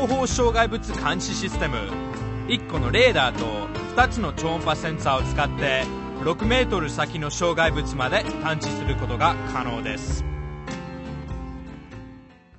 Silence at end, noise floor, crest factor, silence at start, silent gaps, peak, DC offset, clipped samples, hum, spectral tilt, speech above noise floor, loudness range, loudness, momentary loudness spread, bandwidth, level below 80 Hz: 0 s; -46 dBFS; 20 dB; 0 s; none; -4 dBFS; under 0.1%; under 0.1%; none; -4.5 dB/octave; 23 dB; 5 LU; -24 LUFS; 13 LU; 8.4 kHz; -34 dBFS